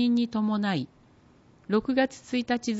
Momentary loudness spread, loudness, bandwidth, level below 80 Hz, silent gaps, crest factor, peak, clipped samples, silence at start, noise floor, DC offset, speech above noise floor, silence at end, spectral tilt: 7 LU; -27 LUFS; 8 kHz; -64 dBFS; none; 16 dB; -12 dBFS; under 0.1%; 0 s; -58 dBFS; under 0.1%; 31 dB; 0 s; -5.5 dB/octave